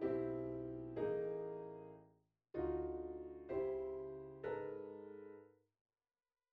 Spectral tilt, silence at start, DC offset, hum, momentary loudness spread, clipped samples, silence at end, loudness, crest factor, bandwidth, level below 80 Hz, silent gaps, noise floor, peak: -8 dB/octave; 0 s; under 0.1%; none; 14 LU; under 0.1%; 1.05 s; -45 LUFS; 16 dB; 4.7 kHz; -66 dBFS; none; -74 dBFS; -30 dBFS